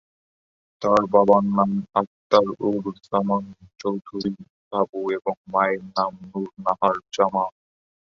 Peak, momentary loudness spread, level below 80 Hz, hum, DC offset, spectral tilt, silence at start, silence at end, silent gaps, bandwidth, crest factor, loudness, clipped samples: -2 dBFS; 12 LU; -62 dBFS; none; under 0.1%; -7 dB/octave; 0.8 s; 0.55 s; 2.07-2.30 s, 4.50-4.71 s, 4.89-4.93 s, 5.37-5.44 s; 7.4 kHz; 22 dB; -23 LUFS; under 0.1%